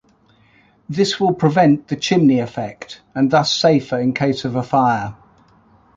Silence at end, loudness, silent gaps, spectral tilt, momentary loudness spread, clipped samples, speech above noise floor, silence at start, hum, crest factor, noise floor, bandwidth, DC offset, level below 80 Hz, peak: 0.85 s; -17 LUFS; none; -5.5 dB/octave; 13 LU; under 0.1%; 38 dB; 0.9 s; none; 16 dB; -55 dBFS; 7.8 kHz; under 0.1%; -56 dBFS; -2 dBFS